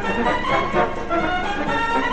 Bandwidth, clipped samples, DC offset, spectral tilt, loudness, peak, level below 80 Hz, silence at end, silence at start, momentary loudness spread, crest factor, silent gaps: 9.8 kHz; under 0.1%; 3%; -5 dB/octave; -21 LUFS; -6 dBFS; -34 dBFS; 0 s; 0 s; 3 LU; 14 dB; none